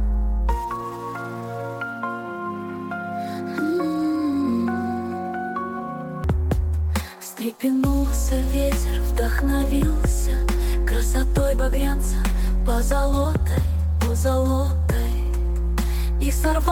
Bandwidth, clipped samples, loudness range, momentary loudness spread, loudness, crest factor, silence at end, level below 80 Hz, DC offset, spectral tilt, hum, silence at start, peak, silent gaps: 17.5 kHz; under 0.1%; 4 LU; 9 LU; -24 LUFS; 14 dB; 0 s; -24 dBFS; under 0.1%; -6.5 dB/octave; none; 0 s; -8 dBFS; none